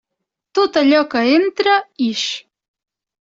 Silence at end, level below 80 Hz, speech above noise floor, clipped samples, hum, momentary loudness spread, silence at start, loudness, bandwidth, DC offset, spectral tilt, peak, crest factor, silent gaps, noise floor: 0.8 s; -64 dBFS; 64 dB; under 0.1%; none; 9 LU; 0.55 s; -16 LUFS; 7.8 kHz; under 0.1%; -3 dB/octave; -2 dBFS; 16 dB; none; -79 dBFS